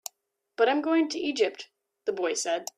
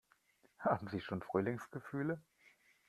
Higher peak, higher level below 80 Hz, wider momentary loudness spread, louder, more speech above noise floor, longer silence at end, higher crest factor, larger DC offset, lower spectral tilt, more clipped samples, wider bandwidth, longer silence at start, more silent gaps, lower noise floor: first, -10 dBFS vs -18 dBFS; about the same, -78 dBFS vs -76 dBFS; first, 19 LU vs 8 LU; first, -27 LUFS vs -40 LUFS; first, 47 dB vs 34 dB; second, 0.15 s vs 0.7 s; about the same, 18 dB vs 22 dB; neither; second, -1.5 dB/octave vs -8 dB/octave; neither; about the same, 14.5 kHz vs 14 kHz; about the same, 0.6 s vs 0.6 s; neither; about the same, -74 dBFS vs -73 dBFS